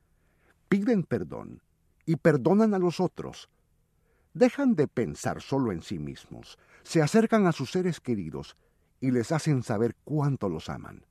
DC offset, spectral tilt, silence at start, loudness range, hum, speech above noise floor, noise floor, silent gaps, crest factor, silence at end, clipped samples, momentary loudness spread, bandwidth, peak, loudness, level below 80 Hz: under 0.1%; -7 dB/octave; 0.7 s; 3 LU; none; 41 dB; -68 dBFS; none; 20 dB; 0.2 s; under 0.1%; 18 LU; 13.5 kHz; -8 dBFS; -27 LUFS; -58 dBFS